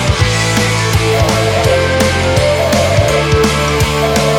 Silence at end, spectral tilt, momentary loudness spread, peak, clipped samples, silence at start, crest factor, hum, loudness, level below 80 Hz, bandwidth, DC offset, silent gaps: 0 s; -4.5 dB/octave; 1 LU; 0 dBFS; under 0.1%; 0 s; 12 dB; none; -12 LUFS; -24 dBFS; 19.5 kHz; under 0.1%; none